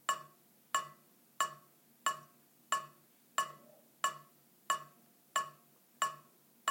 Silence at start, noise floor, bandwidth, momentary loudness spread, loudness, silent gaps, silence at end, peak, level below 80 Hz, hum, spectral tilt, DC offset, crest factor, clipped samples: 0.1 s; -65 dBFS; 17 kHz; 17 LU; -39 LUFS; none; 0 s; -18 dBFS; under -90 dBFS; none; 0.5 dB/octave; under 0.1%; 24 dB; under 0.1%